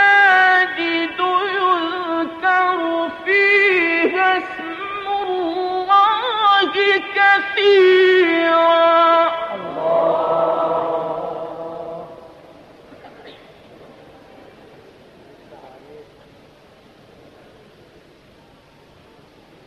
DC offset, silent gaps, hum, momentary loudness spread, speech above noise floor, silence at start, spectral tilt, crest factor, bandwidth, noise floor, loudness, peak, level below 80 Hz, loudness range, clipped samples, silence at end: under 0.1%; none; none; 14 LU; 36 dB; 0 s; -4.5 dB/octave; 14 dB; 7.6 kHz; -49 dBFS; -16 LUFS; -4 dBFS; -62 dBFS; 13 LU; under 0.1%; 3.65 s